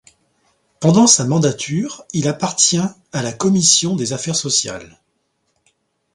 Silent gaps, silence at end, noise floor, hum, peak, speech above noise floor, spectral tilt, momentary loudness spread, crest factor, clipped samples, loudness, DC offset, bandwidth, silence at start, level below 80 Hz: none; 1.3 s; -68 dBFS; none; 0 dBFS; 51 dB; -3.5 dB/octave; 12 LU; 18 dB; under 0.1%; -15 LUFS; under 0.1%; 11.5 kHz; 0.8 s; -56 dBFS